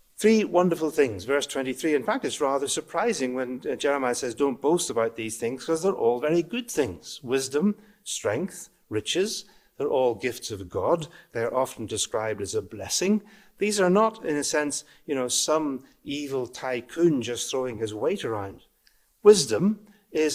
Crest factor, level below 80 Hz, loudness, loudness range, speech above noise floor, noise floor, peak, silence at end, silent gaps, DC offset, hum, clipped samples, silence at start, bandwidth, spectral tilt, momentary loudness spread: 22 dB; -62 dBFS; -26 LUFS; 4 LU; 38 dB; -64 dBFS; -4 dBFS; 0 s; none; under 0.1%; none; under 0.1%; 0.2 s; 16 kHz; -4 dB/octave; 11 LU